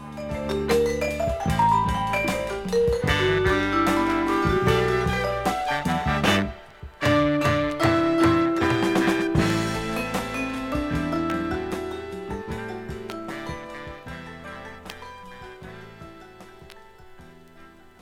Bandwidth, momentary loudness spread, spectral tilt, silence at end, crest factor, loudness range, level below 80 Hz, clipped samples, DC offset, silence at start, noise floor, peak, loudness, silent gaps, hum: 16.5 kHz; 18 LU; -5.5 dB/octave; 0.3 s; 18 dB; 17 LU; -40 dBFS; under 0.1%; under 0.1%; 0 s; -48 dBFS; -6 dBFS; -24 LUFS; none; none